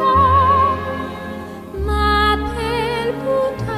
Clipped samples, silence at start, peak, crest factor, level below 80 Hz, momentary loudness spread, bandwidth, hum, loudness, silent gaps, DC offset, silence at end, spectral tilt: under 0.1%; 0 s; -4 dBFS; 14 dB; -28 dBFS; 16 LU; 15 kHz; none; -17 LUFS; none; under 0.1%; 0 s; -6 dB/octave